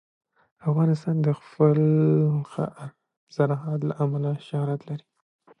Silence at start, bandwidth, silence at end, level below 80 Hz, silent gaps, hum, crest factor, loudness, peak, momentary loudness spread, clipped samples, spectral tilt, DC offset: 0.65 s; 6 kHz; 0.6 s; -68 dBFS; 3.17-3.27 s; none; 18 dB; -24 LUFS; -6 dBFS; 15 LU; under 0.1%; -10 dB/octave; under 0.1%